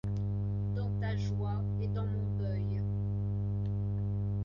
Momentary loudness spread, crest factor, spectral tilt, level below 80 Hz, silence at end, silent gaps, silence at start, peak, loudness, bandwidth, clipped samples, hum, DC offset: 1 LU; 10 dB; -9.5 dB/octave; -44 dBFS; 0 s; none; 0.05 s; -24 dBFS; -34 LUFS; 6.6 kHz; under 0.1%; 50 Hz at -35 dBFS; under 0.1%